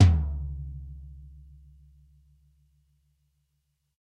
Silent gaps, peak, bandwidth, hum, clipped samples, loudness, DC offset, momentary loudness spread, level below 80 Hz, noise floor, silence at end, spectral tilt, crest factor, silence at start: none; -6 dBFS; 7 kHz; none; under 0.1%; -29 LUFS; under 0.1%; 25 LU; -36 dBFS; -76 dBFS; 2.7 s; -7.5 dB/octave; 24 dB; 0 s